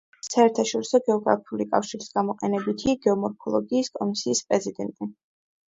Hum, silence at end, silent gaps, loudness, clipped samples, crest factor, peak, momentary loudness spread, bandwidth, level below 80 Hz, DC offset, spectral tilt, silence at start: none; 0.55 s; none; -25 LUFS; under 0.1%; 20 dB; -4 dBFS; 8 LU; 8 kHz; -62 dBFS; under 0.1%; -4.5 dB/octave; 0.25 s